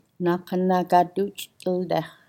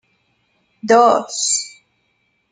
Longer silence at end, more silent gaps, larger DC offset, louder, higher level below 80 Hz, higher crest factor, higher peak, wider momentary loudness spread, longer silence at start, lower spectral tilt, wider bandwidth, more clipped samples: second, 0.2 s vs 0.85 s; neither; neither; second, -24 LUFS vs -15 LUFS; about the same, -72 dBFS vs -70 dBFS; about the same, 20 dB vs 18 dB; about the same, -4 dBFS vs -2 dBFS; second, 9 LU vs 19 LU; second, 0.2 s vs 0.85 s; first, -6.5 dB/octave vs -1.5 dB/octave; first, 17 kHz vs 9.6 kHz; neither